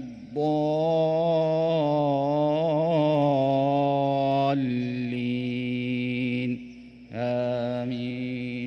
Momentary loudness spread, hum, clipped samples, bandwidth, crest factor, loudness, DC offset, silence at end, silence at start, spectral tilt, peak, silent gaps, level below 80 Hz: 8 LU; none; under 0.1%; 6.8 kHz; 12 dB; -25 LUFS; under 0.1%; 0 s; 0 s; -8.5 dB/octave; -12 dBFS; none; -62 dBFS